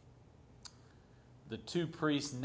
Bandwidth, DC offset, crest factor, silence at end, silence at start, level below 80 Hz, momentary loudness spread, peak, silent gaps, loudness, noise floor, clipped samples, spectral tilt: 8 kHz; under 0.1%; 20 dB; 0 s; 0.05 s; -68 dBFS; 20 LU; -22 dBFS; none; -38 LUFS; -61 dBFS; under 0.1%; -5 dB/octave